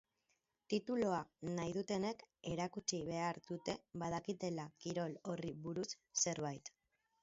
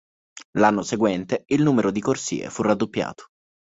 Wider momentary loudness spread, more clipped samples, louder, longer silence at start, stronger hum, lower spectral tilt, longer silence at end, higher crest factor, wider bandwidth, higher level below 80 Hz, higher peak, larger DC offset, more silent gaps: about the same, 8 LU vs 9 LU; neither; second, -42 LUFS vs -22 LUFS; first, 0.7 s vs 0.35 s; neither; about the same, -5 dB/octave vs -5.5 dB/octave; about the same, 0.55 s vs 0.55 s; about the same, 20 dB vs 20 dB; about the same, 7.6 kHz vs 8 kHz; second, -74 dBFS vs -58 dBFS; second, -24 dBFS vs -2 dBFS; neither; second, none vs 0.45-0.53 s